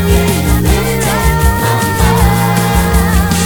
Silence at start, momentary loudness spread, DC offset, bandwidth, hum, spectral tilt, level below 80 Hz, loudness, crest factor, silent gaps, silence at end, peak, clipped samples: 0 s; 2 LU; under 0.1%; over 20 kHz; none; -5 dB/octave; -16 dBFS; -11 LUFS; 10 dB; none; 0 s; 0 dBFS; under 0.1%